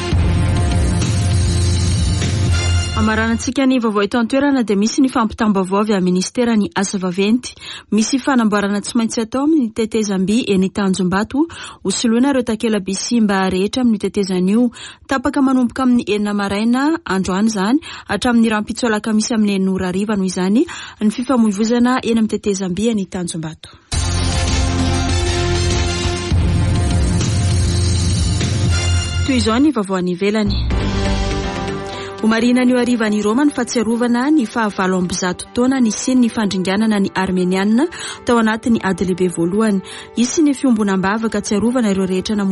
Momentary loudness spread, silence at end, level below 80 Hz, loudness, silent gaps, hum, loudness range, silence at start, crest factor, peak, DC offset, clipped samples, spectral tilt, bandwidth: 5 LU; 0 s; -28 dBFS; -17 LUFS; none; none; 2 LU; 0 s; 12 dB; -4 dBFS; under 0.1%; under 0.1%; -5.5 dB/octave; 11.5 kHz